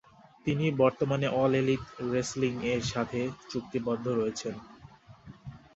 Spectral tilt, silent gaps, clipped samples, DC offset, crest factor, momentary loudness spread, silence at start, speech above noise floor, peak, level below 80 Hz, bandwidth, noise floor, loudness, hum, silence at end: -6 dB/octave; none; under 0.1%; under 0.1%; 20 dB; 12 LU; 0.45 s; 24 dB; -12 dBFS; -58 dBFS; 8.2 kHz; -53 dBFS; -30 LUFS; none; 0.2 s